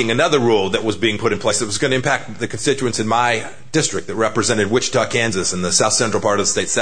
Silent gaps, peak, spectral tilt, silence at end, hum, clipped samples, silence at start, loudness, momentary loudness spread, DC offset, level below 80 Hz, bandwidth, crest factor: none; -2 dBFS; -3 dB/octave; 0 s; none; under 0.1%; 0 s; -17 LUFS; 5 LU; 2%; -50 dBFS; 9.6 kHz; 16 dB